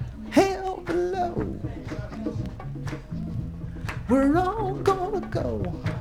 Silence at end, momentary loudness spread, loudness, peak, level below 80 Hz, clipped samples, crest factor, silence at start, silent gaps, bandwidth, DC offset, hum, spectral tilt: 0 s; 13 LU; -27 LUFS; -4 dBFS; -40 dBFS; under 0.1%; 22 dB; 0 s; none; 16 kHz; under 0.1%; none; -7 dB/octave